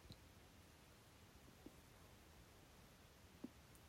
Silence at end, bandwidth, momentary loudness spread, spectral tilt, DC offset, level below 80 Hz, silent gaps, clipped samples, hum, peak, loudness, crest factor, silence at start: 0 s; 16 kHz; 6 LU; -4.5 dB/octave; under 0.1%; -74 dBFS; none; under 0.1%; none; -40 dBFS; -64 LUFS; 24 dB; 0 s